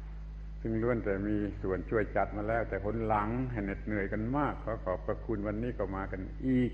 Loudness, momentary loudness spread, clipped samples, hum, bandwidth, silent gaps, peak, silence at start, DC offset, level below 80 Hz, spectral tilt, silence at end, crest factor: -34 LUFS; 6 LU; under 0.1%; none; 6.4 kHz; none; -16 dBFS; 0 s; under 0.1%; -42 dBFS; -10 dB/octave; 0 s; 18 dB